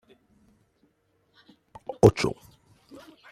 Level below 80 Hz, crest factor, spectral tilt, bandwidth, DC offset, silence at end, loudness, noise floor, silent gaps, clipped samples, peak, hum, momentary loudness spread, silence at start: -50 dBFS; 26 dB; -6.5 dB/octave; 15 kHz; under 0.1%; 1 s; -22 LUFS; -69 dBFS; none; under 0.1%; -2 dBFS; none; 25 LU; 1.9 s